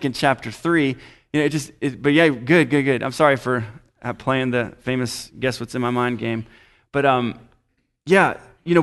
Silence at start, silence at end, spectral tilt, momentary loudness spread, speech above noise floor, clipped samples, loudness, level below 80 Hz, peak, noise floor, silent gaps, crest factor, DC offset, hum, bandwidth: 0 s; 0 s; -6 dB/octave; 12 LU; 48 dB; under 0.1%; -20 LUFS; -54 dBFS; -2 dBFS; -68 dBFS; none; 18 dB; under 0.1%; none; 12 kHz